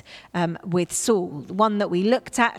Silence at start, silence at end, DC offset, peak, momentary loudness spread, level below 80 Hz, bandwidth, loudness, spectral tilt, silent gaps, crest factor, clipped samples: 0.05 s; 0 s; under 0.1%; -4 dBFS; 6 LU; -60 dBFS; 15.5 kHz; -23 LUFS; -4.5 dB/octave; none; 20 dB; under 0.1%